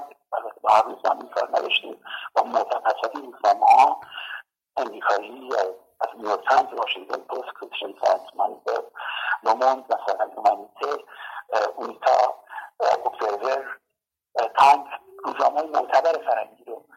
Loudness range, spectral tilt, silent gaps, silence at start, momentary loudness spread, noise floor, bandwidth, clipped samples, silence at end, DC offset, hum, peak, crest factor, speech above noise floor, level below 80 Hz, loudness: 4 LU; -1.5 dB/octave; none; 0 s; 14 LU; -82 dBFS; 15.5 kHz; under 0.1%; 0.2 s; under 0.1%; none; -6 dBFS; 16 dB; 60 dB; -74 dBFS; -23 LUFS